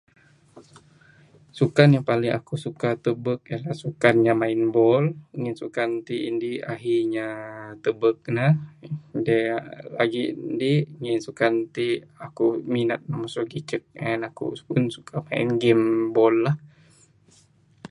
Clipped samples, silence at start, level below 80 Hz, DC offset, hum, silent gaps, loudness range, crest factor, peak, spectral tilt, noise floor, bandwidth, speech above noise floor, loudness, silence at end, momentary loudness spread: under 0.1%; 0.55 s; -66 dBFS; under 0.1%; none; none; 4 LU; 24 dB; 0 dBFS; -7.5 dB/octave; -58 dBFS; 11 kHz; 35 dB; -24 LUFS; 0.05 s; 12 LU